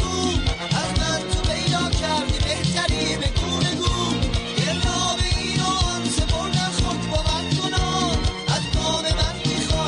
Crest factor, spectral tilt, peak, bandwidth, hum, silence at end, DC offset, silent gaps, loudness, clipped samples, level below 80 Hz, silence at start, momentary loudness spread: 14 dB; -4 dB/octave; -8 dBFS; 11 kHz; none; 0 s; under 0.1%; none; -22 LUFS; under 0.1%; -30 dBFS; 0 s; 2 LU